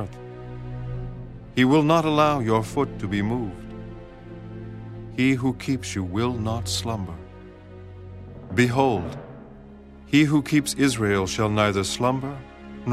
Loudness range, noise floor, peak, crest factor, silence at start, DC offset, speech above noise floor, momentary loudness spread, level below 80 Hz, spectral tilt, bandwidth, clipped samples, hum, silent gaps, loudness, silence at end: 5 LU; -44 dBFS; -4 dBFS; 20 dB; 0 s; under 0.1%; 22 dB; 22 LU; -46 dBFS; -5.5 dB/octave; 15 kHz; under 0.1%; none; none; -23 LUFS; 0 s